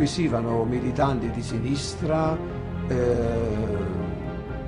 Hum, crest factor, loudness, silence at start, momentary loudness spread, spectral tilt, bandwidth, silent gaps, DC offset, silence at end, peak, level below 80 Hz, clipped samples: none; 14 dB; -26 LUFS; 0 s; 7 LU; -6.5 dB/octave; 11 kHz; none; under 0.1%; 0 s; -10 dBFS; -38 dBFS; under 0.1%